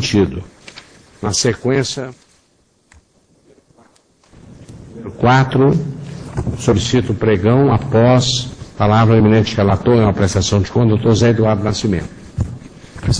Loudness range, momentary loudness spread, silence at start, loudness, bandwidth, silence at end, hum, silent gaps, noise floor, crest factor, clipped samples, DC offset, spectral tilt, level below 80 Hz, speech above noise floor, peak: 9 LU; 16 LU; 0 s; -15 LUFS; 10.5 kHz; 0 s; none; none; -57 dBFS; 16 dB; under 0.1%; under 0.1%; -6 dB/octave; -36 dBFS; 44 dB; 0 dBFS